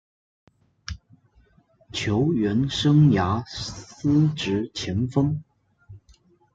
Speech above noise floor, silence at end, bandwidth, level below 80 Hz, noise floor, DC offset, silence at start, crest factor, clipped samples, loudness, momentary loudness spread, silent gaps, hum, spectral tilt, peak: 38 dB; 0.55 s; 7.8 kHz; -50 dBFS; -60 dBFS; under 0.1%; 0.9 s; 18 dB; under 0.1%; -23 LUFS; 20 LU; none; none; -6.5 dB/octave; -8 dBFS